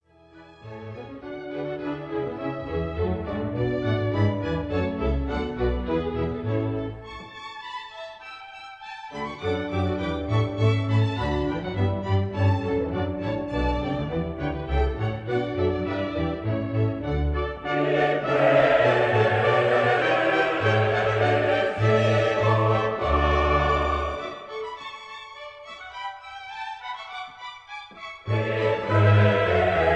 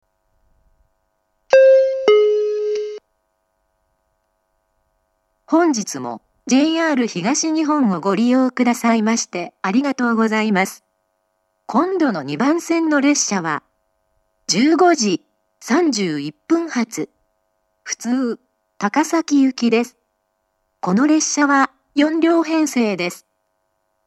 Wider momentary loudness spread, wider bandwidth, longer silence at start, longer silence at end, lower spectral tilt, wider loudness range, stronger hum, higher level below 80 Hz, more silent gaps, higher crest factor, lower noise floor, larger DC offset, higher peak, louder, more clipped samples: first, 18 LU vs 12 LU; second, 8 kHz vs 13 kHz; second, 0.35 s vs 1.5 s; second, 0 s vs 0.9 s; first, -7.5 dB/octave vs -4 dB/octave; first, 11 LU vs 5 LU; neither; first, -38 dBFS vs -70 dBFS; neither; about the same, 18 dB vs 18 dB; second, -51 dBFS vs -70 dBFS; neither; second, -8 dBFS vs 0 dBFS; second, -24 LUFS vs -17 LUFS; neither